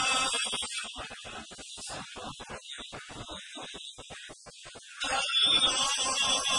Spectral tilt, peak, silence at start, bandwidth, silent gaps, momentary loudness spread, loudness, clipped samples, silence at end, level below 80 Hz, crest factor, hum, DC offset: 0.5 dB/octave; -14 dBFS; 0 s; 11 kHz; none; 21 LU; -27 LUFS; under 0.1%; 0 s; -60 dBFS; 18 dB; none; under 0.1%